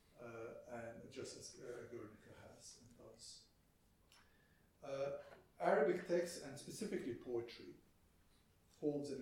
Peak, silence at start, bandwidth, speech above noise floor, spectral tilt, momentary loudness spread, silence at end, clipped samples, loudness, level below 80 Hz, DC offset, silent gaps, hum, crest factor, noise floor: -24 dBFS; 0.15 s; 16.5 kHz; 32 dB; -5 dB/octave; 21 LU; 0 s; under 0.1%; -45 LUFS; -76 dBFS; under 0.1%; none; none; 24 dB; -74 dBFS